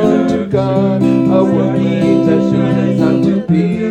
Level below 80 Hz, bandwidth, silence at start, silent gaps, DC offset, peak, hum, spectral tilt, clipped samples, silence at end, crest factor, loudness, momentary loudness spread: -50 dBFS; 8.8 kHz; 0 s; none; under 0.1%; 0 dBFS; none; -8.5 dB/octave; under 0.1%; 0 s; 12 dB; -13 LUFS; 3 LU